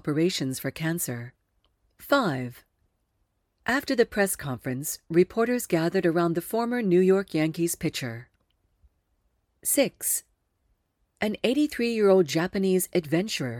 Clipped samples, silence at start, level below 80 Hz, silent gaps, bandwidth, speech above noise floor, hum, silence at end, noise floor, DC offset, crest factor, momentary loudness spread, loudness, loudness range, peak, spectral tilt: under 0.1%; 0.05 s; -60 dBFS; none; 19 kHz; 49 dB; none; 0 s; -74 dBFS; under 0.1%; 20 dB; 10 LU; -25 LUFS; 6 LU; -8 dBFS; -4.5 dB/octave